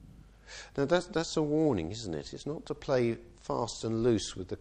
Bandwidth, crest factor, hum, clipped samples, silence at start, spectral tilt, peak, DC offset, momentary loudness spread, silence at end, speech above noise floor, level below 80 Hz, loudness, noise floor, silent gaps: 9.8 kHz; 18 dB; none; under 0.1%; 0 s; -5.5 dB/octave; -14 dBFS; under 0.1%; 11 LU; 0 s; 22 dB; -54 dBFS; -32 LUFS; -54 dBFS; none